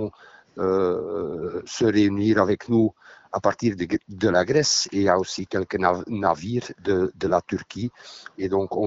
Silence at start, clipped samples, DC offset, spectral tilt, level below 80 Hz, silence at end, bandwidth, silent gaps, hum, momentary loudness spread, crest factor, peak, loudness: 0 s; under 0.1%; under 0.1%; -4.5 dB/octave; -56 dBFS; 0 s; 8 kHz; none; none; 12 LU; 20 dB; -4 dBFS; -23 LUFS